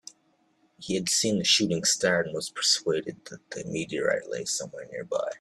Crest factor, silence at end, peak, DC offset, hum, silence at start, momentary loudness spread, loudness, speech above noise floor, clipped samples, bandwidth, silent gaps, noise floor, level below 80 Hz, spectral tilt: 20 dB; 0.05 s; -10 dBFS; under 0.1%; none; 0.8 s; 17 LU; -26 LUFS; 40 dB; under 0.1%; 14 kHz; none; -68 dBFS; -66 dBFS; -2.5 dB/octave